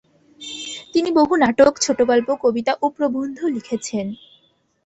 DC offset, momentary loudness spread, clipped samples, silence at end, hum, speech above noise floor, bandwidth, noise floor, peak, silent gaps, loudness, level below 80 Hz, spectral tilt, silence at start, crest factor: under 0.1%; 15 LU; under 0.1%; 0.7 s; none; 43 dB; 8.4 kHz; -61 dBFS; -2 dBFS; none; -19 LUFS; -56 dBFS; -3.5 dB/octave; 0.4 s; 18 dB